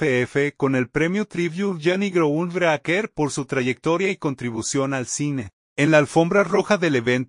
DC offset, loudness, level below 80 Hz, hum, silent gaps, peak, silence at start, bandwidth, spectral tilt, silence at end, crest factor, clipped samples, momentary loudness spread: under 0.1%; -21 LUFS; -58 dBFS; none; 5.53-5.76 s; -4 dBFS; 0 s; 11 kHz; -5 dB/octave; 0.05 s; 18 dB; under 0.1%; 7 LU